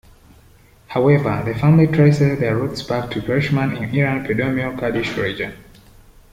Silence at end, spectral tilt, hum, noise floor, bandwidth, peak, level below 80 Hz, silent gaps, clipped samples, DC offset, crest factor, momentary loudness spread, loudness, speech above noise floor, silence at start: 0.7 s; -8 dB/octave; none; -49 dBFS; 11.5 kHz; -2 dBFS; -44 dBFS; none; under 0.1%; under 0.1%; 16 dB; 9 LU; -18 LUFS; 32 dB; 0.9 s